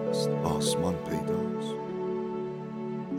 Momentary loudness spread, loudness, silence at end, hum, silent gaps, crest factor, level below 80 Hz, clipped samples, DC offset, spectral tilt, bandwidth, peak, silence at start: 8 LU; -31 LUFS; 0 s; none; none; 18 dB; -56 dBFS; under 0.1%; under 0.1%; -5.5 dB/octave; 16 kHz; -14 dBFS; 0 s